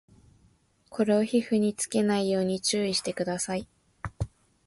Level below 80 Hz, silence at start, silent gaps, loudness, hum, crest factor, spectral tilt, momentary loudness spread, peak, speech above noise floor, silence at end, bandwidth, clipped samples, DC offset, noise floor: -52 dBFS; 0.9 s; none; -27 LUFS; none; 16 dB; -4.5 dB/octave; 13 LU; -12 dBFS; 38 dB; 0.4 s; 11.5 kHz; under 0.1%; under 0.1%; -64 dBFS